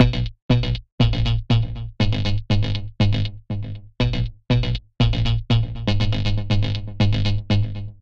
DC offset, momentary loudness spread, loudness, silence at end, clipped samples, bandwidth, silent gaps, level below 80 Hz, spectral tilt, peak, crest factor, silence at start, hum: under 0.1%; 7 LU; -22 LUFS; 0.1 s; under 0.1%; 7 kHz; 0.42-0.49 s, 0.92-0.98 s; -28 dBFS; -7 dB/octave; 0 dBFS; 20 dB; 0 s; none